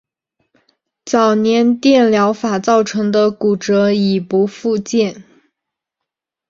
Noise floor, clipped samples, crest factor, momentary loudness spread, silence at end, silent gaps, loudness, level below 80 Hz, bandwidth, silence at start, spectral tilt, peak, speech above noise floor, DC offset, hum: -81 dBFS; under 0.1%; 14 dB; 6 LU; 1.3 s; none; -14 LUFS; -60 dBFS; 7.6 kHz; 1.05 s; -5.5 dB/octave; -2 dBFS; 68 dB; under 0.1%; none